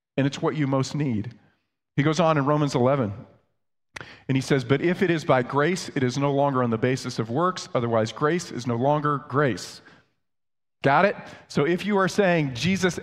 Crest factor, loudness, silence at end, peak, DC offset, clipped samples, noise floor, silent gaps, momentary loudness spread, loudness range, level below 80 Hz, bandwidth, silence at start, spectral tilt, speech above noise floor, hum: 18 dB; -24 LUFS; 0 s; -6 dBFS; under 0.1%; under 0.1%; under -90 dBFS; none; 10 LU; 2 LU; -60 dBFS; 13 kHz; 0.15 s; -6 dB/octave; over 67 dB; none